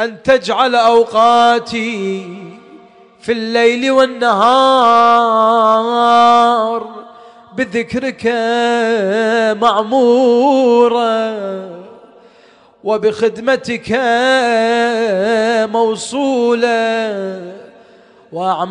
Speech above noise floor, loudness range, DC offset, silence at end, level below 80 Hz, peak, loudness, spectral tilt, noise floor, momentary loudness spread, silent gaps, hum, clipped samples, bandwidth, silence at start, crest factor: 34 dB; 5 LU; under 0.1%; 0 s; -56 dBFS; 0 dBFS; -13 LUFS; -4 dB/octave; -46 dBFS; 13 LU; none; none; under 0.1%; 10.5 kHz; 0 s; 12 dB